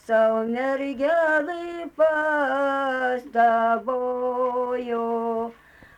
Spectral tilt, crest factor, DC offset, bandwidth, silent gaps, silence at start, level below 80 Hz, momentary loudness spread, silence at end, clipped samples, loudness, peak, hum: -5.5 dB/octave; 14 dB; under 0.1%; 9.8 kHz; none; 0.1 s; -64 dBFS; 7 LU; 0.45 s; under 0.1%; -23 LUFS; -10 dBFS; none